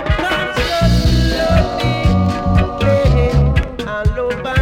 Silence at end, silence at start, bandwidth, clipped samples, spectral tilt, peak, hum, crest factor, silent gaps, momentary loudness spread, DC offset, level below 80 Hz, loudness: 0 s; 0 s; 15.5 kHz; under 0.1%; -6.5 dB/octave; -2 dBFS; none; 12 dB; none; 5 LU; under 0.1%; -20 dBFS; -15 LUFS